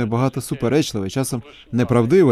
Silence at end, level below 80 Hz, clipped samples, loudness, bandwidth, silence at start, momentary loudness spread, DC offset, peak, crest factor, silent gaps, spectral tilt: 0 s; -48 dBFS; under 0.1%; -20 LUFS; 15 kHz; 0 s; 10 LU; under 0.1%; -4 dBFS; 14 dB; none; -6.5 dB/octave